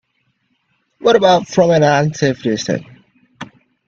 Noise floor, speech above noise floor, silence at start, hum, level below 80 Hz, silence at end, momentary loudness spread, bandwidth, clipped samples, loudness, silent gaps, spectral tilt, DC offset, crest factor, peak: -65 dBFS; 52 dB; 1.05 s; none; -56 dBFS; 0.45 s; 24 LU; 7.6 kHz; under 0.1%; -14 LUFS; none; -5.5 dB/octave; under 0.1%; 16 dB; 0 dBFS